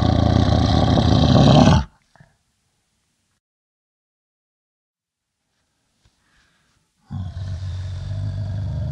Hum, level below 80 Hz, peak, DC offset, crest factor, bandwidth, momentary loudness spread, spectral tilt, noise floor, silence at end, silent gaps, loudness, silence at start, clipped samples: none; -34 dBFS; 0 dBFS; under 0.1%; 20 dB; 8.6 kHz; 18 LU; -7 dB/octave; -80 dBFS; 0 s; 3.40-4.94 s; -18 LUFS; 0 s; under 0.1%